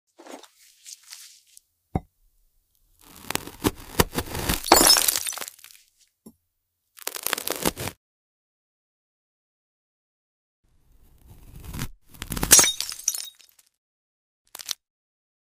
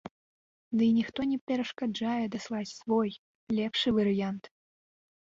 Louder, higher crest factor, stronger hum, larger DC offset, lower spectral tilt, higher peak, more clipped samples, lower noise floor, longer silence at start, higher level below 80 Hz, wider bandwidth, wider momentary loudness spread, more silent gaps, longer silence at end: first, -21 LUFS vs -30 LUFS; first, 28 dB vs 14 dB; neither; neither; second, -1.5 dB/octave vs -6 dB/octave; first, 0 dBFS vs -16 dBFS; neither; second, -77 dBFS vs under -90 dBFS; first, 0.3 s vs 0.05 s; first, -44 dBFS vs -66 dBFS; first, 16 kHz vs 7.6 kHz; first, 27 LU vs 10 LU; first, 7.97-10.63 s, 13.78-14.45 s vs 0.11-0.71 s, 1.41-1.47 s, 3.19-3.47 s; about the same, 0.85 s vs 0.75 s